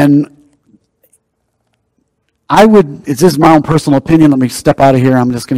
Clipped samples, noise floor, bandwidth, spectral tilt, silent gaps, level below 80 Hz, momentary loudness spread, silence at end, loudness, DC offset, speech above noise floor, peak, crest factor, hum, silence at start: 3%; -64 dBFS; 16 kHz; -6.5 dB/octave; none; -40 dBFS; 6 LU; 0 s; -9 LUFS; under 0.1%; 56 dB; 0 dBFS; 10 dB; none; 0 s